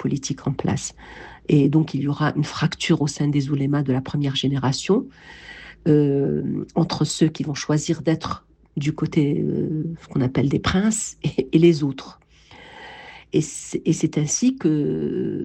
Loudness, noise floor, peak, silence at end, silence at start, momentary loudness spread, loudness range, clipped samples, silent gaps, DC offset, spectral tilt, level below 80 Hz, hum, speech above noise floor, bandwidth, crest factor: -22 LUFS; -46 dBFS; -4 dBFS; 0 s; 0 s; 16 LU; 2 LU; under 0.1%; none; under 0.1%; -5.5 dB/octave; -48 dBFS; none; 25 dB; 9.2 kHz; 18 dB